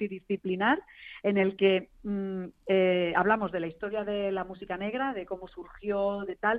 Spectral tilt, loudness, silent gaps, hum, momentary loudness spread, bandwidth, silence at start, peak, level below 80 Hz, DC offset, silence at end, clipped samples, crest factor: -8.5 dB/octave; -29 LUFS; none; none; 12 LU; 4.7 kHz; 0 s; -12 dBFS; -60 dBFS; under 0.1%; 0 s; under 0.1%; 18 dB